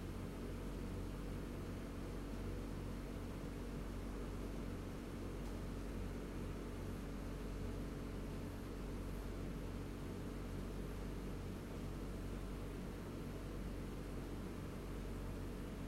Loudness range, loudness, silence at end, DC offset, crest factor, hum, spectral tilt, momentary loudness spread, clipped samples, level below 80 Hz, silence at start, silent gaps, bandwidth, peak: 1 LU; -48 LUFS; 0 s; under 0.1%; 12 dB; none; -6.5 dB/octave; 1 LU; under 0.1%; -50 dBFS; 0 s; none; 16 kHz; -34 dBFS